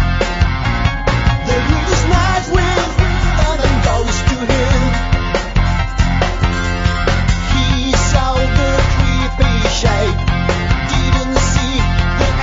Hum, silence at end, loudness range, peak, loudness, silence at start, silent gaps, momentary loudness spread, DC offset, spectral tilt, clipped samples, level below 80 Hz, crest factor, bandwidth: none; 0 s; 1 LU; 0 dBFS; -15 LUFS; 0 s; none; 3 LU; under 0.1%; -5 dB/octave; under 0.1%; -18 dBFS; 14 dB; 7.8 kHz